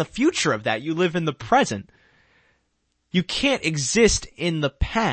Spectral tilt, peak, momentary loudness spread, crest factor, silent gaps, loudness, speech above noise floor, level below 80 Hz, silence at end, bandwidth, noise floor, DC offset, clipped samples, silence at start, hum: -4 dB/octave; -4 dBFS; 8 LU; 20 dB; none; -22 LUFS; 50 dB; -38 dBFS; 0 s; 8.8 kHz; -72 dBFS; under 0.1%; under 0.1%; 0 s; none